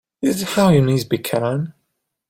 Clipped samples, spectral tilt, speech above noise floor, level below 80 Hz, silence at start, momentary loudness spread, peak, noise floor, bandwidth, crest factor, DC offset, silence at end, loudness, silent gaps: under 0.1%; -6 dB/octave; 56 dB; -50 dBFS; 0.2 s; 10 LU; -2 dBFS; -73 dBFS; 16.5 kHz; 16 dB; under 0.1%; 0.6 s; -18 LUFS; none